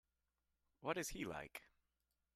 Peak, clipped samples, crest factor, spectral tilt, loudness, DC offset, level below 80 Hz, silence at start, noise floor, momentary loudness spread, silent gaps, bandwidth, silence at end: -28 dBFS; under 0.1%; 24 dB; -3.5 dB/octave; -47 LUFS; under 0.1%; -68 dBFS; 0.8 s; -89 dBFS; 11 LU; none; 14 kHz; 0.7 s